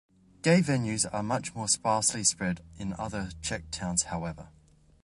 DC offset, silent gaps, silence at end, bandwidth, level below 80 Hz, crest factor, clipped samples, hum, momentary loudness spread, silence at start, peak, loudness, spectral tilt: under 0.1%; none; 0.55 s; 11.5 kHz; -52 dBFS; 22 dB; under 0.1%; none; 12 LU; 0.45 s; -8 dBFS; -29 LUFS; -3.5 dB/octave